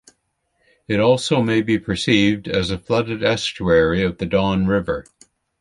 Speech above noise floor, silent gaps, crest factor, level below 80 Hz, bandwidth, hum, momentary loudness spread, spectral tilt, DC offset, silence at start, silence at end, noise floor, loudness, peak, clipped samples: 51 dB; none; 16 dB; -42 dBFS; 11.5 kHz; none; 6 LU; -5.5 dB/octave; under 0.1%; 0.9 s; 0.6 s; -69 dBFS; -19 LUFS; -2 dBFS; under 0.1%